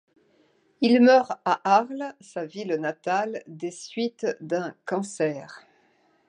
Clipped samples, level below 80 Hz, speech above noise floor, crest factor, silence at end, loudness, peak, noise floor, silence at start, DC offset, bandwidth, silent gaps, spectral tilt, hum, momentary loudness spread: under 0.1%; -82 dBFS; 40 dB; 20 dB; 0.7 s; -25 LUFS; -6 dBFS; -64 dBFS; 0.8 s; under 0.1%; 10.5 kHz; none; -5 dB/octave; none; 17 LU